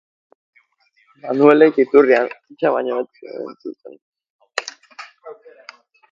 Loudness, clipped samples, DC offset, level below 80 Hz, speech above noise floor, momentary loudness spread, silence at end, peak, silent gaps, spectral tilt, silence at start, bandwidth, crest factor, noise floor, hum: -16 LUFS; under 0.1%; under 0.1%; -68 dBFS; 45 dB; 25 LU; 0.8 s; 0 dBFS; 4.02-4.13 s, 4.30-4.39 s; -5.5 dB/octave; 1.25 s; 7.8 kHz; 20 dB; -61 dBFS; none